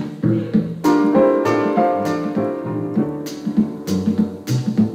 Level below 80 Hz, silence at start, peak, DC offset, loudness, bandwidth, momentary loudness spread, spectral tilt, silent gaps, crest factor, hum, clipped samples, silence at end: -54 dBFS; 0 s; -4 dBFS; under 0.1%; -19 LUFS; 16 kHz; 7 LU; -7.5 dB/octave; none; 14 dB; none; under 0.1%; 0 s